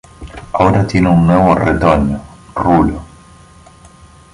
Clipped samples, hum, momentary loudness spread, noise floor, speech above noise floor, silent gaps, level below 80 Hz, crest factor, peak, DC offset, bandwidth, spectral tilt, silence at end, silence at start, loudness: under 0.1%; none; 16 LU; -41 dBFS; 30 dB; none; -30 dBFS; 14 dB; 0 dBFS; under 0.1%; 11 kHz; -8 dB/octave; 1.3 s; 0.2 s; -12 LUFS